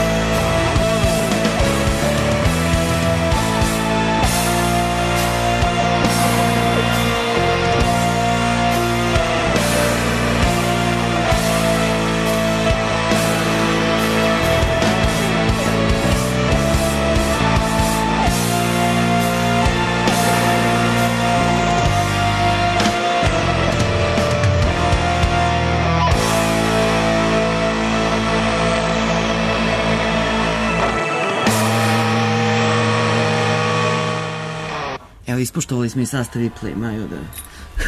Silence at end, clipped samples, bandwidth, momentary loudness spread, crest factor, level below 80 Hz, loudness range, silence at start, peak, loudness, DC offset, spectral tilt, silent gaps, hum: 0 s; under 0.1%; 13.5 kHz; 3 LU; 12 dB; -28 dBFS; 1 LU; 0 s; -4 dBFS; -17 LUFS; under 0.1%; -5 dB/octave; none; none